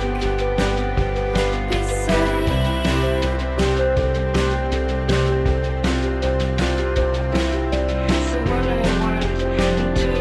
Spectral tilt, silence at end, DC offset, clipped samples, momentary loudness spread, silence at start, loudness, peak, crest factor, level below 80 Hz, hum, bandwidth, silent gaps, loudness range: -6 dB/octave; 0 s; under 0.1%; under 0.1%; 3 LU; 0 s; -21 LUFS; -6 dBFS; 12 dB; -24 dBFS; none; 12 kHz; none; 1 LU